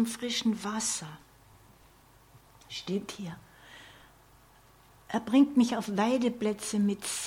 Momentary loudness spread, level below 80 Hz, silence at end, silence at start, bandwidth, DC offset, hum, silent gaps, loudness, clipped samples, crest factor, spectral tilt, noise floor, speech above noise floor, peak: 23 LU; -66 dBFS; 0 s; 0 s; 17 kHz; under 0.1%; none; none; -29 LUFS; under 0.1%; 20 dB; -4 dB/octave; -59 dBFS; 30 dB; -12 dBFS